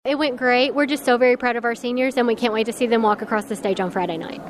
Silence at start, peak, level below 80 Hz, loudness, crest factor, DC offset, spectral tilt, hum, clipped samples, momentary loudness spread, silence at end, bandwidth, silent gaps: 0.05 s; -6 dBFS; -62 dBFS; -20 LUFS; 16 dB; under 0.1%; -4.5 dB/octave; none; under 0.1%; 6 LU; 0 s; 14 kHz; none